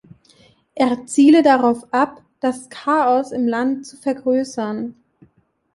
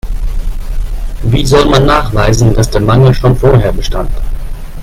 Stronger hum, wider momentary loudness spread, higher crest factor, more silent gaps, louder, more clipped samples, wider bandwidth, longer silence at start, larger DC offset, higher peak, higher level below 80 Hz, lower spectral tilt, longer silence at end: neither; about the same, 13 LU vs 15 LU; first, 16 dB vs 10 dB; neither; second, -18 LUFS vs -10 LUFS; second, under 0.1% vs 0.2%; second, 11.5 kHz vs 15.5 kHz; first, 0.75 s vs 0.05 s; neither; about the same, -2 dBFS vs 0 dBFS; second, -64 dBFS vs -16 dBFS; second, -4.5 dB/octave vs -6 dB/octave; first, 0.85 s vs 0 s